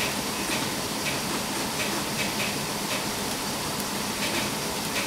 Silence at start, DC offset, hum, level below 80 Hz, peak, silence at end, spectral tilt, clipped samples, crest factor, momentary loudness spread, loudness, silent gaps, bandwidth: 0 s; under 0.1%; none; -52 dBFS; -14 dBFS; 0 s; -2.5 dB/octave; under 0.1%; 16 dB; 2 LU; -27 LUFS; none; 16 kHz